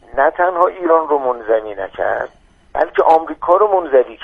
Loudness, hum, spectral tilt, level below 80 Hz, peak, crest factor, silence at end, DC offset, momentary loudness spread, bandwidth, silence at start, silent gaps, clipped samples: -15 LUFS; none; -6.5 dB/octave; -48 dBFS; 0 dBFS; 16 dB; 0 s; under 0.1%; 9 LU; 5.2 kHz; 0.15 s; none; under 0.1%